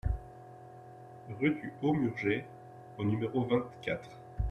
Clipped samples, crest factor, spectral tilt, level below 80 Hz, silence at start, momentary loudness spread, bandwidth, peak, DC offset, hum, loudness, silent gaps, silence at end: under 0.1%; 18 dB; -8.5 dB/octave; -46 dBFS; 0.05 s; 20 LU; 9 kHz; -16 dBFS; under 0.1%; none; -34 LUFS; none; 0 s